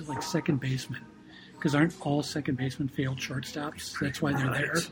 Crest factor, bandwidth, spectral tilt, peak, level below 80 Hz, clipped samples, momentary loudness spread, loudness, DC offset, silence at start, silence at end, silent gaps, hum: 20 dB; 19.5 kHz; -5.5 dB/octave; -12 dBFS; -60 dBFS; under 0.1%; 11 LU; -30 LUFS; under 0.1%; 0 s; 0 s; none; none